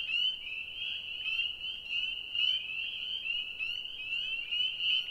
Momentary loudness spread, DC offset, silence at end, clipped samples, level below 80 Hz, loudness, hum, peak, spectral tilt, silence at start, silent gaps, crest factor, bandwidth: 7 LU; under 0.1%; 0 s; under 0.1%; -64 dBFS; -32 LUFS; none; -18 dBFS; 0 dB/octave; 0 s; none; 16 dB; 16 kHz